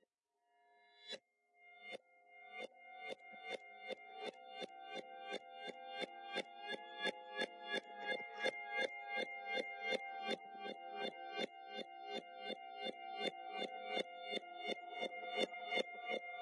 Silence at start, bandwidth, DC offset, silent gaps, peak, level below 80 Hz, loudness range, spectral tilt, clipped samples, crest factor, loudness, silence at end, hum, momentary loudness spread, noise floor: 0.7 s; 11.5 kHz; under 0.1%; none; -24 dBFS; under -90 dBFS; 9 LU; -2.5 dB/octave; under 0.1%; 22 dB; -45 LUFS; 0 s; none; 10 LU; -85 dBFS